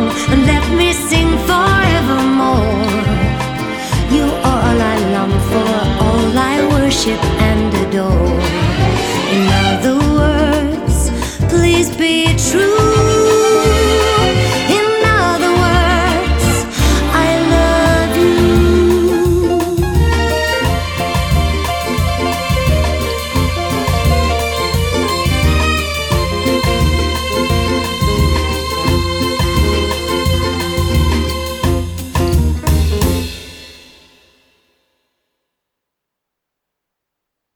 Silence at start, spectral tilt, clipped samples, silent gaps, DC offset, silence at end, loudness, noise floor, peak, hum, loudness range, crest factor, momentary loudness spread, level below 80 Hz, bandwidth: 0 s; -5 dB/octave; under 0.1%; none; under 0.1%; 3.8 s; -13 LUFS; -79 dBFS; 0 dBFS; none; 4 LU; 12 dB; 6 LU; -20 dBFS; 19.5 kHz